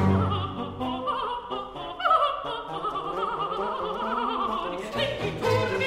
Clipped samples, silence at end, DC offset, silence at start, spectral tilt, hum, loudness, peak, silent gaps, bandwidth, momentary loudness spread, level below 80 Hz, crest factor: under 0.1%; 0 s; under 0.1%; 0 s; -6 dB/octave; none; -28 LUFS; -10 dBFS; none; 15 kHz; 9 LU; -52 dBFS; 16 dB